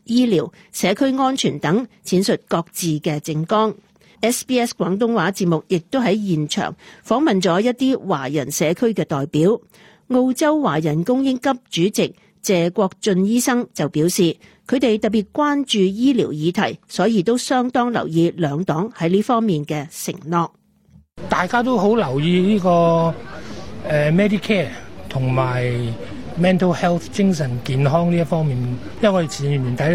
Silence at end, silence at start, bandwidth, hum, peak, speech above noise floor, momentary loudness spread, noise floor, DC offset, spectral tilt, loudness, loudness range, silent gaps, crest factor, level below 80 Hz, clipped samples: 0 s; 0.1 s; 16.5 kHz; none; -4 dBFS; 34 dB; 7 LU; -52 dBFS; under 0.1%; -5.5 dB/octave; -19 LUFS; 2 LU; none; 16 dB; -52 dBFS; under 0.1%